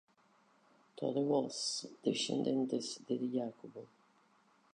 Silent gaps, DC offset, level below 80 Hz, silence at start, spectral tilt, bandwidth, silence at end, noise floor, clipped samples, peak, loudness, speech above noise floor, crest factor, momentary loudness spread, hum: none; under 0.1%; -88 dBFS; 0.95 s; -4.5 dB/octave; 10 kHz; 0.9 s; -70 dBFS; under 0.1%; -20 dBFS; -37 LUFS; 34 dB; 20 dB; 11 LU; none